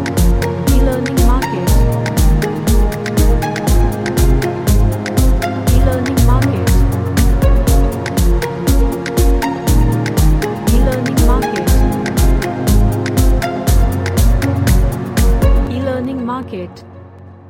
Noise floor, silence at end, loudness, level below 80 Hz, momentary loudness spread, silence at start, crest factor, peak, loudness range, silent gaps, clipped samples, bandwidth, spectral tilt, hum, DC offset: -35 dBFS; 0 s; -15 LUFS; -14 dBFS; 3 LU; 0 s; 12 dB; 0 dBFS; 1 LU; none; under 0.1%; 17 kHz; -6 dB/octave; none; under 0.1%